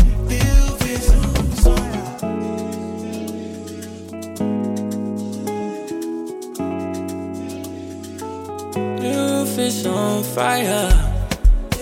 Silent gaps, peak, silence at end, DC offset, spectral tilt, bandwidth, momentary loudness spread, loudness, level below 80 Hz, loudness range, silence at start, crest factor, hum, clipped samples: none; -2 dBFS; 0 s; under 0.1%; -5.5 dB/octave; 16.5 kHz; 13 LU; -22 LUFS; -22 dBFS; 7 LU; 0 s; 18 dB; none; under 0.1%